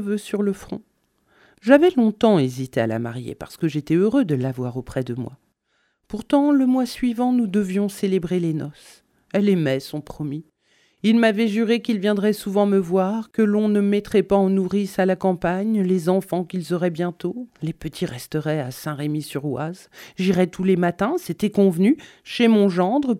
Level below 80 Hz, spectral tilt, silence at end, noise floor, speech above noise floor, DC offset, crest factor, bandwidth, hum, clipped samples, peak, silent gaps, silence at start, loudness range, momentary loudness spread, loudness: -54 dBFS; -7 dB/octave; 0 s; -69 dBFS; 48 dB; under 0.1%; 20 dB; 15 kHz; none; under 0.1%; 0 dBFS; none; 0 s; 5 LU; 13 LU; -21 LUFS